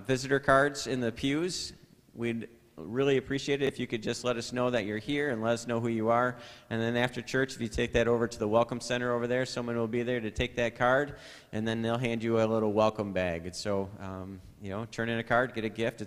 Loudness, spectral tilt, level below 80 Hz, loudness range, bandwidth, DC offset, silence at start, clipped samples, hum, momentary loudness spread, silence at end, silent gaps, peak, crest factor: -30 LUFS; -5 dB/octave; -54 dBFS; 2 LU; 15 kHz; under 0.1%; 0 s; under 0.1%; none; 11 LU; 0 s; none; -10 dBFS; 22 dB